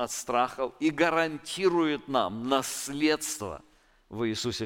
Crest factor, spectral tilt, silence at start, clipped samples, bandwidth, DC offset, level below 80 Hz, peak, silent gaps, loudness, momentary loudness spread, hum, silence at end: 18 dB; -3.5 dB/octave; 0 s; under 0.1%; 17 kHz; under 0.1%; -60 dBFS; -10 dBFS; none; -28 LUFS; 8 LU; none; 0 s